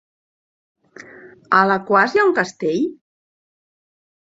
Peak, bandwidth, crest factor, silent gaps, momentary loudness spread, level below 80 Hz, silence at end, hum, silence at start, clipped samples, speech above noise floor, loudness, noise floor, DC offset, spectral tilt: -2 dBFS; 7.8 kHz; 20 dB; none; 7 LU; -68 dBFS; 1.3 s; none; 1.25 s; under 0.1%; 26 dB; -17 LUFS; -42 dBFS; under 0.1%; -5.5 dB/octave